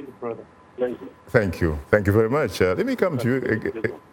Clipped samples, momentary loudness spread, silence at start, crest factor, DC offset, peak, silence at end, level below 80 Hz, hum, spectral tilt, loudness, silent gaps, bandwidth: under 0.1%; 14 LU; 0 s; 22 dB; under 0.1%; 0 dBFS; 0.15 s; -44 dBFS; none; -7 dB/octave; -23 LUFS; none; 17.5 kHz